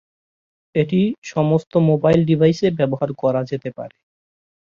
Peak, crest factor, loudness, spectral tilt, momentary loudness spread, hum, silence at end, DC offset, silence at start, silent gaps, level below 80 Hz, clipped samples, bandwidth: -2 dBFS; 18 dB; -18 LUFS; -8 dB/octave; 12 LU; none; 0.8 s; under 0.1%; 0.75 s; 1.18-1.22 s, 1.67-1.71 s; -54 dBFS; under 0.1%; 7.2 kHz